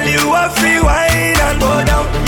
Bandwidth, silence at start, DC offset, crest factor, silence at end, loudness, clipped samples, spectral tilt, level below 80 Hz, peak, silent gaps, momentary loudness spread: 17.5 kHz; 0 s; under 0.1%; 10 dB; 0 s; -12 LUFS; under 0.1%; -4 dB/octave; -20 dBFS; -2 dBFS; none; 2 LU